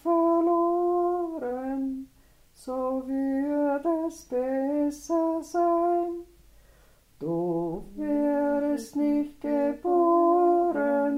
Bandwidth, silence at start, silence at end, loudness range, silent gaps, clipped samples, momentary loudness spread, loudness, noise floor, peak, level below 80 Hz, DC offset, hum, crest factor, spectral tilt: 13 kHz; 0.05 s; 0 s; 5 LU; none; under 0.1%; 10 LU; -26 LUFS; -58 dBFS; -12 dBFS; -58 dBFS; under 0.1%; none; 14 dB; -7 dB/octave